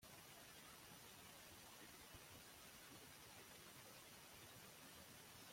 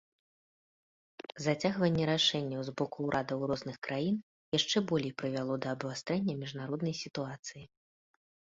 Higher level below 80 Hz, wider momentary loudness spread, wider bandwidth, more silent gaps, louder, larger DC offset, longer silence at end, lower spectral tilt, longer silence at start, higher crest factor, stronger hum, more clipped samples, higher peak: second, -82 dBFS vs -68 dBFS; second, 0 LU vs 10 LU; first, 16.5 kHz vs 7.8 kHz; second, none vs 3.78-3.82 s, 4.23-4.52 s, 7.39-7.43 s; second, -60 LUFS vs -33 LUFS; neither; second, 0 s vs 0.8 s; second, -2 dB/octave vs -5 dB/octave; second, 0 s vs 1.35 s; about the same, 16 dB vs 20 dB; neither; neither; second, -46 dBFS vs -16 dBFS